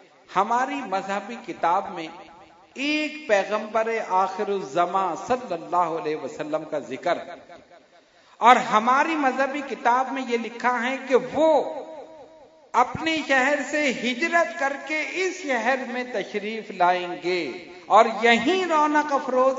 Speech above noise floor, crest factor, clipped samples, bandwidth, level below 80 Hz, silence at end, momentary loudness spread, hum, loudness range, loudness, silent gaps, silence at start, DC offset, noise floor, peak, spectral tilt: 32 dB; 24 dB; under 0.1%; 7.8 kHz; -68 dBFS; 0 s; 11 LU; none; 5 LU; -23 LUFS; none; 0.3 s; under 0.1%; -55 dBFS; 0 dBFS; -3.5 dB/octave